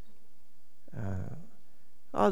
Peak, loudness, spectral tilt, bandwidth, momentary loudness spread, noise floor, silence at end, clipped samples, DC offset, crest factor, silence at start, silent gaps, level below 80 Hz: -10 dBFS; -37 LUFS; -7.5 dB/octave; 19.5 kHz; 16 LU; -63 dBFS; 0 s; under 0.1%; 2%; 24 dB; 0.95 s; none; -62 dBFS